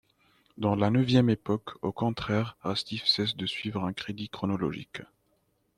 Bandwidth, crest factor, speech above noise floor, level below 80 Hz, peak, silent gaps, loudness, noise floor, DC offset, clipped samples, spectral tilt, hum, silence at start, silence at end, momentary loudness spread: 12 kHz; 20 dB; 43 dB; -60 dBFS; -10 dBFS; none; -29 LUFS; -72 dBFS; under 0.1%; under 0.1%; -6.5 dB/octave; none; 0.55 s; 0.75 s; 12 LU